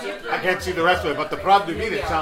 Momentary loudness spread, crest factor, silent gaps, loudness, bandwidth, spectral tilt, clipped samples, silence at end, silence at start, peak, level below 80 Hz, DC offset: 6 LU; 18 dB; none; -21 LUFS; 16 kHz; -4.5 dB/octave; under 0.1%; 0 s; 0 s; -4 dBFS; -42 dBFS; under 0.1%